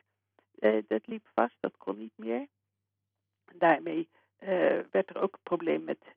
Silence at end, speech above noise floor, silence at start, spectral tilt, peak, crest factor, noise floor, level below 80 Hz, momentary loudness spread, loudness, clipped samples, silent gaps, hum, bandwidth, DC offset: 0.2 s; 55 dB; 0.6 s; -4 dB/octave; -10 dBFS; 22 dB; -86 dBFS; -82 dBFS; 13 LU; -31 LUFS; under 0.1%; none; none; 4.6 kHz; under 0.1%